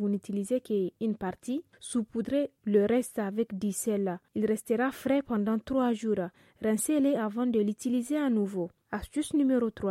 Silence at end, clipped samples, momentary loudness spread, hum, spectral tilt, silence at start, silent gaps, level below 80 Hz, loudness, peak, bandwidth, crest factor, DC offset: 0 s; under 0.1%; 8 LU; none; -6 dB/octave; 0 s; none; -62 dBFS; -30 LUFS; -14 dBFS; 16 kHz; 16 dB; under 0.1%